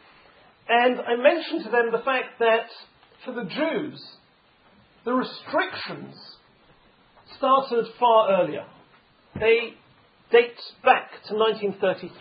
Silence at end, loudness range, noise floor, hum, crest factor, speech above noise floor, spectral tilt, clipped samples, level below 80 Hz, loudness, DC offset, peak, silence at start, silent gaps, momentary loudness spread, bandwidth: 0.1 s; 7 LU; -59 dBFS; none; 22 dB; 36 dB; -9 dB/octave; under 0.1%; -68 dBFS; -23 LUFS; under 0.1%; -2 dBFS; 0.7 s; none; 16 LU; 5.2 kHz